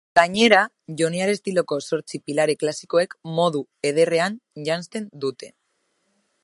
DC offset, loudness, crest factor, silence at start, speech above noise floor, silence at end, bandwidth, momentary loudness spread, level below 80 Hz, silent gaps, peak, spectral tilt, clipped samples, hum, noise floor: under 0.1%; -22 LUFS; 22 dB; 0.15 s; 50 dB; 0.95 s; 11.5 kHz; 13 LU; -68 dBFS; none; 0 dBFS; -4 dB/octave; under 0.1%; none; -71 dBFS